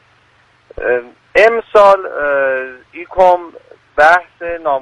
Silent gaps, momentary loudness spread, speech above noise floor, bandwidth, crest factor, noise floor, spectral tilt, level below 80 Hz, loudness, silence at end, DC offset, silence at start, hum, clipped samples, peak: none; 14 LU; 39 dB; 11 kHz; 14 dB; -52 dBFS; -4 dB/octave; -44 dBFS; -13 LUFS; 0 s; under 0.1%; 0.8 s; none; 0.2%; 0 dBFS